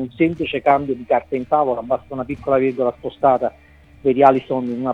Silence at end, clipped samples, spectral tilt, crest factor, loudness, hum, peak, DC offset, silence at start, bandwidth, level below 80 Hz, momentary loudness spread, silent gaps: 0 s; under 0.1%; -8.5 dB/octave; 18 dB; -19 LUFS; none; 0 dBFS; under 0.1%; 0 s; 6 kHz; -50 dBFS; 9 LU; none